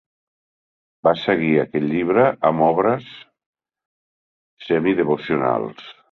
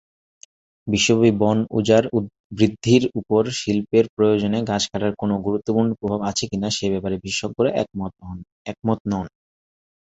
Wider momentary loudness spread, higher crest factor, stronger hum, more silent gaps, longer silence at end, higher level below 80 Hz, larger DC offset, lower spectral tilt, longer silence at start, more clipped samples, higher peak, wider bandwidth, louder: second, 8 LU vs 12 LU; about the same, 20 dB vs 20 dB; neither; first, 3.46-3.53 s, 3.85-4.57 s vs 2.40-2.50 s, 4.09-4.17 s, 8.52-8.65 s, 9.00-9.05 s; second, 0.2 s vs 0.85 s; second, -60 dBFS vs -50 dBFS; neither; first, -9 dB/octave vs -5 dB/octave; first, 1.05 s vs 0.85 s; neither; about the same, -2 dBFS vs -2 dBFS; second, 6.2 kHz vs 8.2 kHz; about the same, -19 LUFS vs -21 LUFS